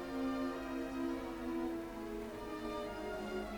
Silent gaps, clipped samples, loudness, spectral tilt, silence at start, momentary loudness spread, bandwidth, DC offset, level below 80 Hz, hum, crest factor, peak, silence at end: none; under 0.1%; -42 LUFS; -5.5 dB/octave; 0 s; 5 LU; 19 kHz; under 0.1%; -58 dBFS; none; 14 dB; -28 dBFS; 0 s